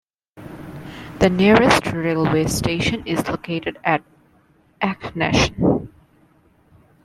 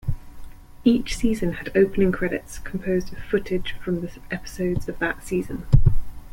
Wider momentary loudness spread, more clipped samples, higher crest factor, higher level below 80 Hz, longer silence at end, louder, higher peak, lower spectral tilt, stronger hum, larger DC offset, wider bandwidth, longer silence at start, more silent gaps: first, 22 LU vs 12 LU; neither; about the same, 20 dB vs 18 dB; second, -42 dBFS vs -30 dBFS; first, 1.2 s vs 0 s; first, -19 LUFS vs -24 LUFS; first, 0 dBFS vs -4 dBFS; second, -5 dB/octave vs -7 dB/octave; neither; neither; about the same, 15 kHz vs 16 kHz; first, 0.35 s vs 0.05 s; neither